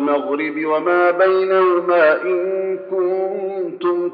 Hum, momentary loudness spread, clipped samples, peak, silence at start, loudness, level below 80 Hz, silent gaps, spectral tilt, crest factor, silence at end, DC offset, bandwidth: none; 8 LU; under 0.1%; -4 dBFS; 0 s; -17 LUFS; under -90 dBFS; none; -3.5 dB/octave; 14 dB; 0 s; under 0.1%; 5 kHz